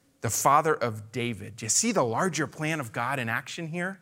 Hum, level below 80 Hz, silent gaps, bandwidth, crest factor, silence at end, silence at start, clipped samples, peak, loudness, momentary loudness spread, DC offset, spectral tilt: none; -70 dBFS; none; 16 kHz; 20 dB; 0.05 s; 0.25 s; under 0.1%; -6 dBFS; -27 LUFS; 10 LU; under 0.1%; -3.5 dB/octave